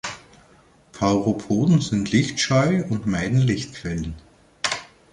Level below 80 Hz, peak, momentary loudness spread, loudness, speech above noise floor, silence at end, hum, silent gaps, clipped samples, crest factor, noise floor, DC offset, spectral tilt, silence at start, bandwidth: -46 dBFS; -6 dBFS; 12 LU; -22 LUFS; 33 dB; 0.3 s; none; none; under 0.1%; 16 dB; -54 dBFS; under 0.1%; -5.5 dB/octave; 0.05 s; 11 kHz